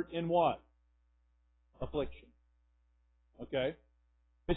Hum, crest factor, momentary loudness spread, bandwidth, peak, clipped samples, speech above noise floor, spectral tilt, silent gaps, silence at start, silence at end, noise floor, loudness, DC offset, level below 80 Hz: 60 Hz at -65 dBFS; 22 dB; 18 LU; 3.9 kHz; -18 dBFS; under 0.1%; 38 dB; -4 dB/octave; none; 0 s; 0 s; -72 dBFS; -36 LUFS; under 0.1%; -56 dBFS